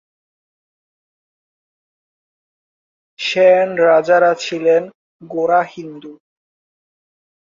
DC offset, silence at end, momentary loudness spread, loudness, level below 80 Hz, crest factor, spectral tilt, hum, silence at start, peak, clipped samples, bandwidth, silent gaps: under 0.1%; 1.25 s; 17 LU; -14 LUFS; -68 dBFS; 18 dB; -4.5 dB/octave; none; 3.2 s; -2 dBFS; under 0.1%; 7.6 kHz; 4.95-5.19 s